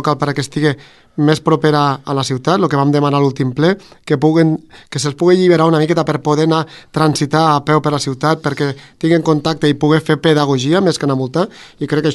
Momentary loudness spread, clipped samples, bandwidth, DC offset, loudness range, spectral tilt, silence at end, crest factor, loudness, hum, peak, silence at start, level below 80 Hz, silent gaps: 8 LU; under 0.1%; 12 kHz; under 0.1%; 1 LU; -6 dB/octave; 0 s; 14 dB; -14 LUFS; none; 0 dBFS; 0 s; -52 dBFS; none